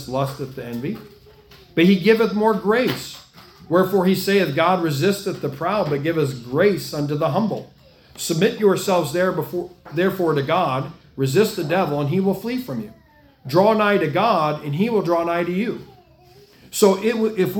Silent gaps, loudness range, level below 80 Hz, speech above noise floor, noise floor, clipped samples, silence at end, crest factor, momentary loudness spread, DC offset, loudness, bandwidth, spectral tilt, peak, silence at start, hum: none; 3 LU; -56 dBFS; 30 dB; -50 dBFS; under 0.1%; 0 s; 18 dB; 12 LU; under 0.1%; -20 LUFS; 18 kHz; -6 dB/octave; -2 dBFS; 0 s; none